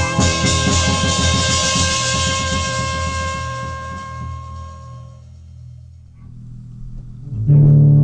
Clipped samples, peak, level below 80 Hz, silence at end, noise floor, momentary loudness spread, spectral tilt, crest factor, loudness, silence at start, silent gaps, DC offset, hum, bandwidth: under 0.1%; -2 dBFS; -32 dBFS; 0 s; -39 dBFS; 23 LU; -4 dB/octave; 14 dB; -16 LUFS; 0 s; none; under 0.1%; none; 10.5 kHz